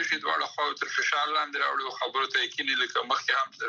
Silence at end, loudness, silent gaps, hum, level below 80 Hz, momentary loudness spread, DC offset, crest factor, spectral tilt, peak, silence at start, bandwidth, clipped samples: 0 s; -27 LUFS; none; none; -88 dBFS; 4 LU; under 0.1%; 16 dB; 0 dB/octave; -12 dBFS; 0 s; 8 kHz; under 0.1%